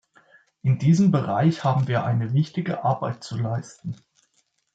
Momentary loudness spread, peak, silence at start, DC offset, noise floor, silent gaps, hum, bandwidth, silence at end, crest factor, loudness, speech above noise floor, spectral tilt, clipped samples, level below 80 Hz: 14 LU; -8 dBFS; 0.65 s; under 0.1%; -69 dBFS; none; none; 8 kHz; 0.8 s; 16 dB; -23 LUFS; 47 dB; -8 dB/octave; under 0.1%; -64 dBFS